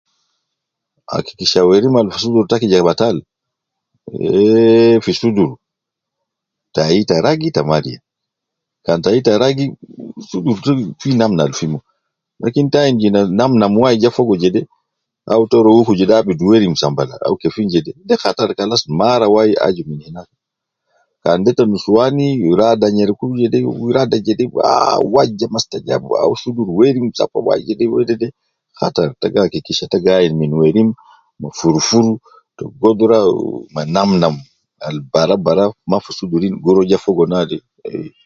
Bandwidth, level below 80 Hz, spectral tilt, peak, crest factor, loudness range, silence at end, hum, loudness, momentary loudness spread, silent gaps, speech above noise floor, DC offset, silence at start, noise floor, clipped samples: 7.6 kHz; -50 dBFS; -6 dB/octave; 0 dBFS; 14 dB; 3 LU; 0.2 s; none; -14 LUFS; 12 LU; none; 67 dB; under 0.1%; 1.1 s; -80 dBFS; under 0.1%